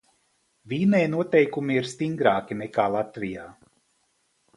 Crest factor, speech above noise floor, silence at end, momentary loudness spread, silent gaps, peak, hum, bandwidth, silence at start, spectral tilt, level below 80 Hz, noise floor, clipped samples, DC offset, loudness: 22 dB; 46 dB; 1.05 s; 12 LU; none; -4 dBFS; none; 11.5 kHz; 0.65 s; -6.5 dB/octave; -64 dBFS; -70 dBFS; under 0.1%; under 0.1%; -24 LUFS